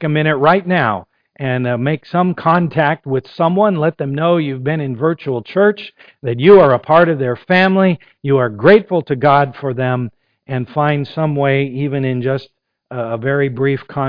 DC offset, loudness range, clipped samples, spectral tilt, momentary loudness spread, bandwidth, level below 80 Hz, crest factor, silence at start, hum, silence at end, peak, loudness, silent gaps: under 0.1%; 6 LU; under 0.1%; -9.5 dB/octave; 12 LU; 5.2 kHz; -52 dBFS; 14 dB; 0 s; none; 0 s; 0 dBFS; -15 LUFS; none